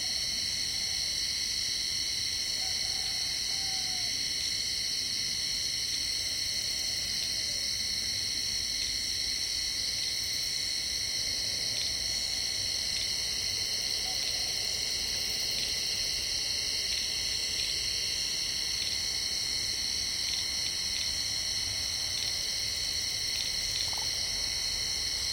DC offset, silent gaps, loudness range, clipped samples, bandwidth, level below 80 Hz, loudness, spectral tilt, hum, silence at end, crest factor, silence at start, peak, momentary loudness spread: under 0.1%; none; 0 LU; under 0.1%; 17 kHz; -52 dBFS; -29 LUFS; 0.5 dB/octave; none; 0 s; 16 dB; 0 s; -16 dBFS; 1 LU